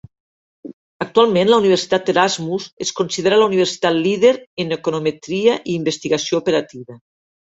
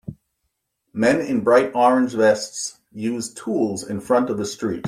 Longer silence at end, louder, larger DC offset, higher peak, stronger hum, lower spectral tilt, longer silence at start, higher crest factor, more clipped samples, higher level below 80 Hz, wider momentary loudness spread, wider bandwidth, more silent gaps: first, 0.5 s vs 0 s; first, -17 LUFS vs -20 LUFS; neither; about the same, -2 dBFS vs -4 dBFS; neither; about the same, -4.5 dB/octave vs -4.5 dB/octave; first, 0.65 s vs 0.1 s; about the same, 16 dB vs 18 dB; neither; about the same, -60 dBFS vs -60 dBFS; second, 9 LU vs 12 LU; second, 8 kHz vs 15 kHz; first, 0.73-1.00 s, 2.73-2.77 s, 4.47-4.57 s vs none